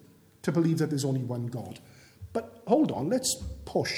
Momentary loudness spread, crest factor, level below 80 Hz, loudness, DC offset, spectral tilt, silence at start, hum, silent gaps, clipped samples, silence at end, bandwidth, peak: 13 LU; 20 dB; -52 dBFS; -29 LUFS; under 0.1%; -5.5 dB/octave; 0.45 s; none; none; under 0.1%; 0 s; 18.5 kHz; -10 dBFS